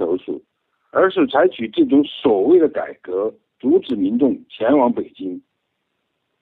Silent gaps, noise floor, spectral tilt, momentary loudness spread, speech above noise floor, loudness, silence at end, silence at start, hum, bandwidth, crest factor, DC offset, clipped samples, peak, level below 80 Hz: none; -73 dBFS; -9 dB/octave; 14 LU; 56 dB; -18 LUFS; 1.05 s; 0 s; none; 4.2 kHz; 14 dB; under 0.1%; under 0.1%; -4 dBFS; -60 dBFS